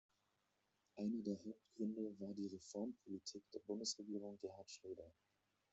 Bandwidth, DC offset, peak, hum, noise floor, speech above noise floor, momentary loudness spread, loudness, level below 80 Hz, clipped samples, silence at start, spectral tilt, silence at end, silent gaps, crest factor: 8 kHz; under 0.1%; -32 dBFS; none; -85 dBFS; 37 dB; 11 LU; -49 LUFS; -88 dBFS; under 0.1%; 0.95 s; -6 dB/octave; 0.6 s; none; 18 dB